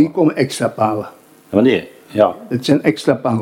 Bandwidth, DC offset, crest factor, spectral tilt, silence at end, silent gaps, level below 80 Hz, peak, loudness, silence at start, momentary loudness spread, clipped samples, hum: 16 kHz; under 0.1%; 16 dB; -6 dB/octave; 0 s; none; -58 dBFS; 0 dBFS; -17 LUFS; 0 s; 8 LU; under 0.1%; none